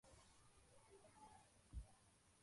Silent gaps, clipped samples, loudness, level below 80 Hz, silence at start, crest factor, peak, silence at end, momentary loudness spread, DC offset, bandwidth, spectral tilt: none; under 0.1%; -65 LUFS; -66 dBFS; 0.05 s; 22 dB; -42 dBFS; 0 s; 9 LU; under 0.1%; 11.5 kHz; -4.5 dB/octave